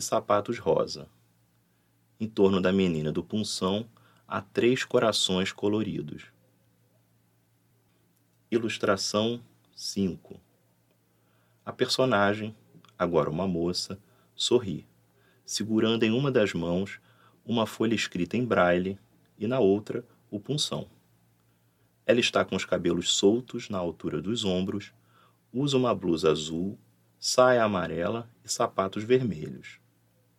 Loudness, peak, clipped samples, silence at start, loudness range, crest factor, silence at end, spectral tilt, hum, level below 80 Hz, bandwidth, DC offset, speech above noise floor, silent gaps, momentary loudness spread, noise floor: -27 LUFS; -8 dBFS; under 0.1%; 0 s; 5 LU; 20 dB; 0.65 s; -4.5 dB/octave; none; -62 dBFS; 15 kHz; under 0.1%; 41 dB; none; 14 LU; -68 dBFS